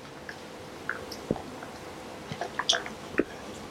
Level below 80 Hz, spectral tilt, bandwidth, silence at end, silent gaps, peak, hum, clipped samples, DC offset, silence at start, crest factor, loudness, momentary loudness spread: -58 dBFS; -3 dB/octave; 16.5 kHz; 0 s; none; -6 dBFS; none; under 0.1%; under 0.1%; 0 s; 28 dB; -34 LUFS; 15 LU